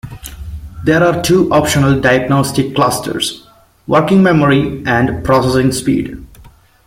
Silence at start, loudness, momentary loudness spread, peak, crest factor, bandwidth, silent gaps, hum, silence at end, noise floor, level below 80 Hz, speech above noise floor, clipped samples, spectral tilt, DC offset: 0.05 s; -13 LUFS; 19 LU; 0 dBFS; 12 dB; 16.5 kHz; none; none; 0.4 s; -42 dBFS; -36 dBFS; 30 dB; under 0.1%; -5.5 dB/octave; under 0.1%